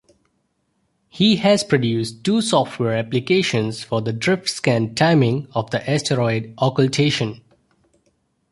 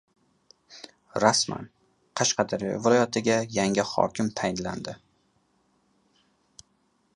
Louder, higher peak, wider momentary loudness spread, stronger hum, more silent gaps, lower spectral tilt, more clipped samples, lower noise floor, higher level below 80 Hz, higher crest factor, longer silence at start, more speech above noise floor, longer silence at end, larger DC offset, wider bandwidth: first, -19 LUFS vs -25 LUFS; about the same, -2 dBFS vs -2 dBFS; second, 7 LU vs 22 LU; neither; neither; first, -5.5 dB/octave vs -3.5 dB/octave; neither; about the same, -69 dBFS vs -69 dBFS; first, -56 dBFS vs -62 dBFS; second, 18 dB vs 26 dB; first, 1.15 s vs 0.7 s; first, 50 dB vs 44 dB; second, 1.15 s vs 2.2 s; neither; about the same, 11.5 kHz vs 11.5 kHz